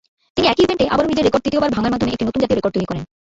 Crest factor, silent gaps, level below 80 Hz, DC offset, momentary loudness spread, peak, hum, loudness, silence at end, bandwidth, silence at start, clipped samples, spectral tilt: 16 dB; none; -42 dBFS; under 0.1%; 8 LU; -2 dBFS; none; -18 LUFS; 0.3 s; 8 kHz; 0.35 s; under 0.1%; -6 dB/octave